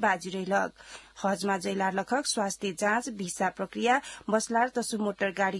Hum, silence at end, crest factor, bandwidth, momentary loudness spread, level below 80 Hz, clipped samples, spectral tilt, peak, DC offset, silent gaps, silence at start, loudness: none; 0 s; 18 dB; 12 kHz; 5 LU; -66 dBFS; under 0.1%; -3.5 dB/octave; -12 dBFS; under 0.1%; none; 0 s; -29 LUFS